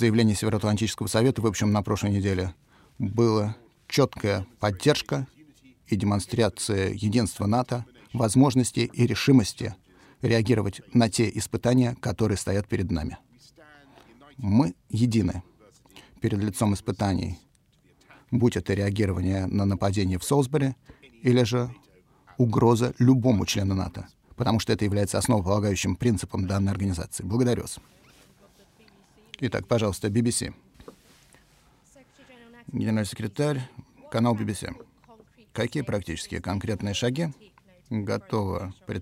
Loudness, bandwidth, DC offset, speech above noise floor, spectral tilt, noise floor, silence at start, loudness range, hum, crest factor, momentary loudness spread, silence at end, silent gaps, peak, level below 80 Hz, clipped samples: -26 LUFS; 16 kHz; under 0.1%; 38 dB; -6 dB/octave; -62 dBFS; 0 s; 6 LU; none; 18 dB; 12 LU; 0 s; none; -6 dBFS; -52 dBFS; under 0.1%